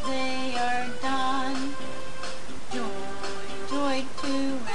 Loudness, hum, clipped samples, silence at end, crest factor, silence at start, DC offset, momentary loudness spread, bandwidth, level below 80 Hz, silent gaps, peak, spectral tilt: -30 LUFS; none; under 0.1%; 0 s; 14 dB; 0 s; 6%; 10 LU; 10 kHz; -52 dBFS; none; -14 dBFS; -3.5 dB/octave